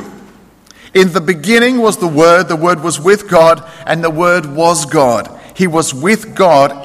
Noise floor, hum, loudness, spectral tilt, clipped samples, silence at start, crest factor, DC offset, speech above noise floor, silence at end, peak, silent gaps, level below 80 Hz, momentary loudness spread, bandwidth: -42 dBFS; none; -11 LUFS; -4.5 dB/octave; 0.3%; 0 s; 12 dB; under 0.1%; 31 dB; 0 s; 0 dBFS; none; -48 dBFS; 7 LU; 15.5 kHz